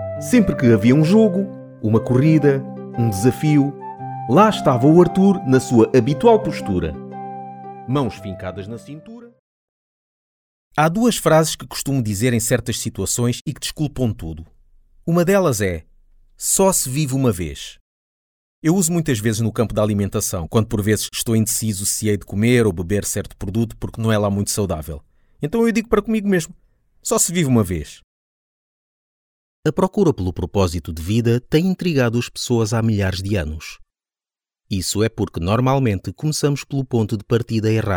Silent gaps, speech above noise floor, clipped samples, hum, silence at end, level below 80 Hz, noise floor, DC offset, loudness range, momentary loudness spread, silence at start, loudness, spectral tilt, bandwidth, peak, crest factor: 9.39-10.71 s, 13.41-13.45 s, 17.81-18.62 s, 28.04-29.63 s; over 72 dB; under 0.1%; none; 0 s; -42 dBFS; under -90 dBFS; under 0.1%; 6 LU; 15 LU; 0 s; -18 LUFS; -5.5 dB/octave; over 20 kHz; -2 dBFS; 16 dB